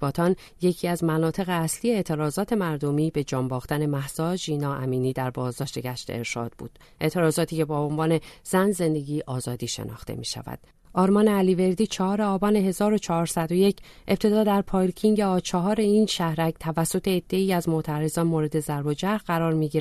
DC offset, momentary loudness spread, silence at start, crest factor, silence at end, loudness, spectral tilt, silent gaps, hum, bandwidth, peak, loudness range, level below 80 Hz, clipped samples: under 0.1%; 10 LU; 0 s; 16 dB; 0 s; -25 LUFS; -6 dB/octave; none; none; 13.5 kHz; -8 dBFS; 5 LU; -50 dBFS; under 0.1%